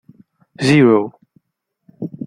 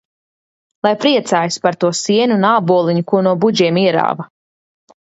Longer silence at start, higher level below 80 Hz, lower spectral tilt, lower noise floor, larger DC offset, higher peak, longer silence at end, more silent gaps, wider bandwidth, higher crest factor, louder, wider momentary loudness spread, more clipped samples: second, 0.6 s vs 0.85 s; first, -56 dBFS vs -64 dBFS; first, -6.5 dB/octave vs -5 dB/octave; second, -74 dBFS vs under -90 dBFS; neither; about the same, -2 dBFS vs 0 dBFS; second, 0 s vs 0.8 s; neither; first, 10.5 kHz vs 8.2 kHz; about the same, 16 dB vs 16 dB; about the same, -14 LUFS vs -14 LUFS; first, 20 LU vs 6 LU; neither